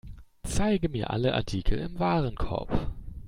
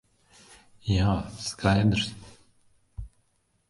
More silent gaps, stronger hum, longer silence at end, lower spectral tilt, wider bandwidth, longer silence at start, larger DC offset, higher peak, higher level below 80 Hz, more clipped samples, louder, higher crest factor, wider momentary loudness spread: neither; neither; second, 0 s vs 0.6 s; about the same, -6 dB/octave vs -5.5 dB/octave; first, 15 kHz vs 11.5 kHz; second, 0.05 s vs 0.85 s; neither; second, -12 dBFS vs -8 dBFS; first, -36 dBFS vs -42 dBFS; neither; second, -29 LUFS vs -26 LUFS; second, 16 dB vs 22 dB; second, 7 LU vs 24 LU